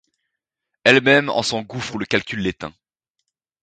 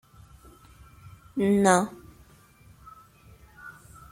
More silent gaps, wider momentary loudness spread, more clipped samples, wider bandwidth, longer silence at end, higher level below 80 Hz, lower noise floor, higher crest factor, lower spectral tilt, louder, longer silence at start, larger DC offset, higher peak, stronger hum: neither; second, 14 LU vs 28 LU; neither; second, 9.4 kHz vs 16 kHz; first, 0.9 s vs 0.4 s; about the same, -54 dBFS vs -58 dBFS; first, -80 dBFS vs -55 dBFS; about the same, 22 dB vs 24 dB; about the same, -4 dB/octave vs -5 dB/octave; first, -18 LUFS vs -24 LUFS; second, 0.85 s vs 1.35 s; neither; first, 0 dBFS vs -6 dBFS; neither